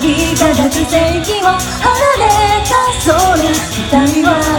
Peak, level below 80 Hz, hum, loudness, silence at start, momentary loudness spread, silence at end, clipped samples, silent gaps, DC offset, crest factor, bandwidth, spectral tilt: 0 dBFS; -26 dBFS; none; -11 LUFS; 0 s; 3 LU; 0 s; under 0.1%; none; under 0.1%; 12 dB; 18.5 kHz; -4 dB/octave